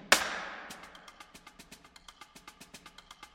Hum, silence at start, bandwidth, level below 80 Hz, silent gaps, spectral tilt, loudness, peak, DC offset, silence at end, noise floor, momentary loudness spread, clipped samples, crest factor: none; 0 s; 16.5 kHz; -66 dBFS; none; 0 dB/octave; -32 LUFS; -4 dBFS; under 0.1%; 0.1 s; -55 dBFS; 22 LU; under 0.1%; 34 dB